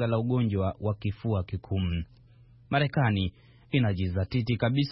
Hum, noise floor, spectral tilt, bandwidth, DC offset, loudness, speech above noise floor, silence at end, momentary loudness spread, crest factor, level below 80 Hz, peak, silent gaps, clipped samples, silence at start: none; -55 dBFS; -11.5 dB/octave; 5.8 kHz; under 0.1%; -29 LUFS; 28 dB; 0 s; 6 LU; 18 dB; -48 dBFS; -10 dBFS; none; under 0.1%; 0 s